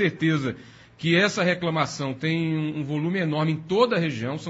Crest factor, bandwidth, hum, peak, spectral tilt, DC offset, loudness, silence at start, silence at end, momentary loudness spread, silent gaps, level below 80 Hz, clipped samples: 16 dB; 8 kHz; none; -8 dBFS; -6 dB/octave; under 0.1%; -24 LUFS; 0 s; 0 s; 7 LU; none; -62 dBFS; under 0.1%